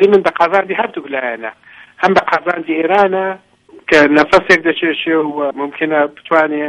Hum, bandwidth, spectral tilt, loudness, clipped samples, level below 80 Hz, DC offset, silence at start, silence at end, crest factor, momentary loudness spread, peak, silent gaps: none; 10.5 kHz; -5 dB/octave; -13 LUFS; under 0.1%; -52 dBFS; under 0.1%; 0 s; 0 s; 14 dB; 11 LU; 0 dBFS; none